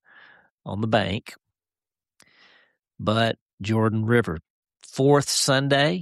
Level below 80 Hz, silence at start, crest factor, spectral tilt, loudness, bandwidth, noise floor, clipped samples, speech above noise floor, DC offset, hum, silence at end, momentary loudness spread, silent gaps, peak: -56 dBFS; 0.65 s; 18 dB; -4.5 dB/octave; -23 LUFS; 13 kHz; under -90 dBFS; under 0.1%; over 68 dB; under 0.1%; none; 0 s; 14 LU; 3.41-3.46 s, 3.53-3.58 s, 4.50-4.62 s; -6 dBFS